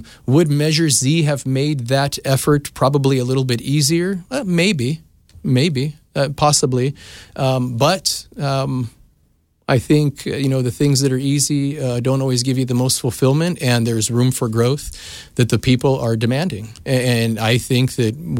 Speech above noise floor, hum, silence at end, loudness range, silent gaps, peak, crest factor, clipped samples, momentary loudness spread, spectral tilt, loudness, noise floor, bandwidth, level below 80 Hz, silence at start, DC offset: 43 dB; none; 0 s; 2 LU; none; -2 dBFS; 14 dB; under 0.1%; 8 LU; -5 dB/octave; -17 LUFS; -60 dBFS; 16.5 kHz; -46 dBFS; 0 s; under 0.1%